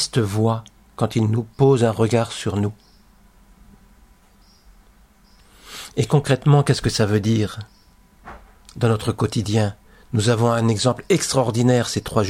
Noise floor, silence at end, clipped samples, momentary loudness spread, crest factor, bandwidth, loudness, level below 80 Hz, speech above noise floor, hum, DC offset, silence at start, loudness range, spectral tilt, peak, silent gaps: -53 dBFS; 0 s; under 0.1%; 10 LU; 16 dB; 15.5 kHz; -20 LUFS; -48 dBFS; 34 dB; none; under 0.1%; 0 s; 8 LU; -6 dB/octave; -4 dBFS; none